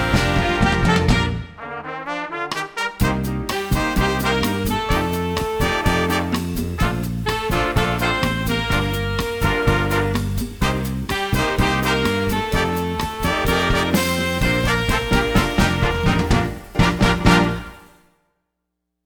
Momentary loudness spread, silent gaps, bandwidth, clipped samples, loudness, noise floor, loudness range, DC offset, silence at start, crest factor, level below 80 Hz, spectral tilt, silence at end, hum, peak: 7 LU; none; over 20 kHz; under 0.1%; -20 LUFS; -77 dBFS; 3 LU; under 0.1%; 0 s; 18 dB; -28 dBFS; -5 dB/octave; 1.25 s; none; -2 dBFS